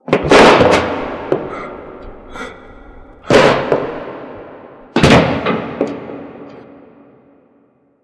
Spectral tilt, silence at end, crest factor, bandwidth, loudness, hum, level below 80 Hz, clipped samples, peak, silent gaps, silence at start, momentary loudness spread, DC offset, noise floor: -5 dB/octave; 1.45 s; 16 dB; 11 kHz; -12 LUFS; none; -38 dBFS; under 0.1%; 0 dBFS; none; 0.1 s; 26 LU; under 0.1%; -54 dBFS